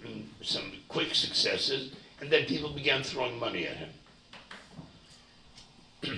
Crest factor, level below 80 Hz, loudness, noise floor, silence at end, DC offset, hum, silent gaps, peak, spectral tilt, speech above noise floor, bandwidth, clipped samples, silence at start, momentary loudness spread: 24 dB; -62 dBFS; -30 LUFS; -57 dBFS; 0 s; under 0.1%; none; none; -10 dBFS; -3 dB/octave; 26 dB; 10.5 kHz; under 0.1%; 0 s; 21 LU